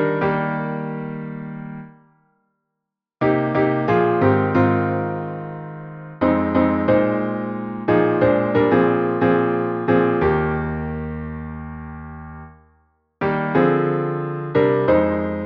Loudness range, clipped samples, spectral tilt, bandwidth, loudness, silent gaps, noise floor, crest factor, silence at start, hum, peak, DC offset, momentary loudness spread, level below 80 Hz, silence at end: 7 LU; under 0.1%; -10 dB/octave; 5.8 kHz; -19 LUFS; none; -81 dBFS; 16 dB; 0 s; none; -4 dBFS; under 0.1%; 16 LU; -44 dBFS; 0 s